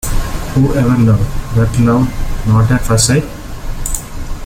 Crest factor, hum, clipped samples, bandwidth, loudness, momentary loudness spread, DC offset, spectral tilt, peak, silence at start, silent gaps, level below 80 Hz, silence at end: 12 dB; none; under 0.1%; 17 kHz; -13 LUFS; 13 LU; under 0.1%; -5.5 dB/octave; 0 dBFS; 0.05 s; none; -20 dBFS; 0 s